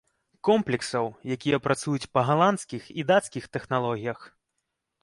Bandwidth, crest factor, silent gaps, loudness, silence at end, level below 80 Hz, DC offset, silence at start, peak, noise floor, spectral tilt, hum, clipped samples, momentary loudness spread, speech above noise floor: 11.5 kHz; 20 dB; none; -26 LUFS; 0.75 s; -64 dBFS; under 0.1%; 0.45 s; -8 dBFS; -81 dBFS; -5.5 dB/octave; none; under 0.1%; 12 LU; 55 dB